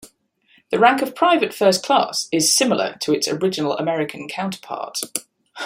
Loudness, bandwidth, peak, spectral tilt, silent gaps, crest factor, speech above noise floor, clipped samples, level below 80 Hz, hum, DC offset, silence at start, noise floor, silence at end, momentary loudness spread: -19 LUFS; 16 kHz; -2 dBFS; -3 dB/octave; none; 18 dB; 40 dB; under 0.1%; -66 dBFS; none; under 0.1%; 0.05 s; -59 dBFS; 0 s; 11 LU